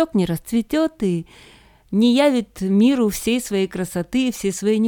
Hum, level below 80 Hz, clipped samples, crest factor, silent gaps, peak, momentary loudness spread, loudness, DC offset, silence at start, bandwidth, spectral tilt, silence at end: none; -48 dBFS; under 0.1%; 16 dB; none; -4 dBFS; 8 LU; -20 LUFS; under 0.1%; 0 s; 18 kHz; -5.5 dB/octave; 0 s